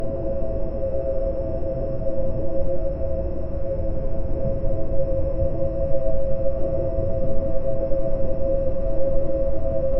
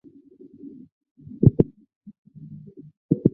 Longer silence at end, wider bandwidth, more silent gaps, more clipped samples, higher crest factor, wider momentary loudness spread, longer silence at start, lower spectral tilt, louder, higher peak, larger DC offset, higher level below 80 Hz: about the same, 0 s vs 0.05 s; first, 2.6 kHz vs 2 kHz; second, none vs 1.96-2.01 s, 2.18-2.25 s, 2.97-3.09 s; neither; second, 12 dB vs 24 dB; second, 3 LU vs 26 LU; second, 0 s vs 1.4 s; second, -11 dB/octave vs -15 dB/octave; second, -26 LUFS vs -22 LUFS; second, -6 dBFS vs -2 dBFS; neither; first, -26 dBFS vs -44 dBFS